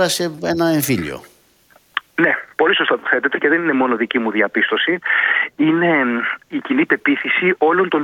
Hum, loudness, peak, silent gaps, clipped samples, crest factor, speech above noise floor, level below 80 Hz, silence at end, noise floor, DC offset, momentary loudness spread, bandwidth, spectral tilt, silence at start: none; -17 LUFS; 0 dBFS; none; under 0.1%; 18 dB; 36 dB; -58 dBFS; 0 s; -53 dBFS; under 0.1%; 7 LU; 18 kHz; -4 dB/octave; 0 s